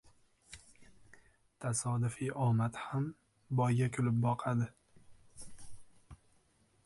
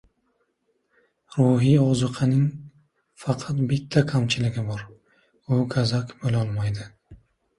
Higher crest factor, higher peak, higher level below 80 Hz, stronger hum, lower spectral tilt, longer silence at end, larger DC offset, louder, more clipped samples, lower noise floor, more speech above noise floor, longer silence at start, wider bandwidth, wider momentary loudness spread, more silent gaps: about the same, 16 dB vs 18 dB; second, -20 dBFS vs -6 dBFS; second, -66 dBFS vs -52 dBFS; neither; about the same, -6.5 dB/octave vs -7 dB/octave; first, 0.7 s vs 0.45 s; neither; second, -35 LUFS vs -23 LUFS; neither; about the same, -71 dBFS vs -72 dBFS; second, 38 dB vs 50 dB; second, 0.5 s vs 1.3 s; about the same, 11.5 kHz vs 11 kHz; first, 22 LU vs 14 LU; neither